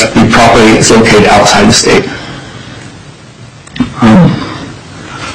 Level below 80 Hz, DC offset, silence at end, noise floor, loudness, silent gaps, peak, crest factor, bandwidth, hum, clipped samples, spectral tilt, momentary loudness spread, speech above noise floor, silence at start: -28 dBFS; under 0.1%; 0 s; -31 dBFS; -5 LUFS; none; 0 dBFS; 8 dB; 16 kHz; none; 0.6%; -4.5 dB/octave; 22 LU; 26 dB; 0 s